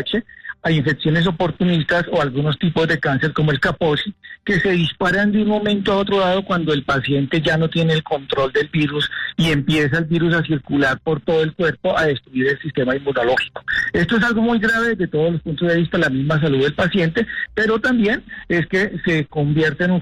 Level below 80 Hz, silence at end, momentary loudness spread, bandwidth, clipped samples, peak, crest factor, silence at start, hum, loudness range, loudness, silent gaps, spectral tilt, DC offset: -44 dBFS; 0 s; 4 LU; 10.5 kHz; under 0.1%; -8 dBFS; 10 dB; 0 s; none; 1 LU; -18 LUFS; none; -6.5 dB/octave; under 0.1%